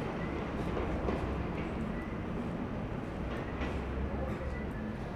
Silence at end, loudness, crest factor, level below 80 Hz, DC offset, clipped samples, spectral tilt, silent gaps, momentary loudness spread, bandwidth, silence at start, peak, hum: 0 s; -37 LUFS; 16 dB; -42 dBFS; under 0.1%; under 0.1%; -8 dB/octave; none; 4 LU; 10.5 kHz; 0 s; -20 dBFS; none